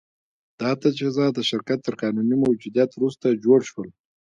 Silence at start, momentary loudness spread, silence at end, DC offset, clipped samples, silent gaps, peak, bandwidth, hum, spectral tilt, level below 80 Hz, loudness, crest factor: 0.6 s; 9 LU; 0.35 s; under 0.1%; under 0.1%; none; -6 dBFS; 7.8 kHz; none; -6 dB/octave; -66 dBFS; -22 LUFS; 18 dB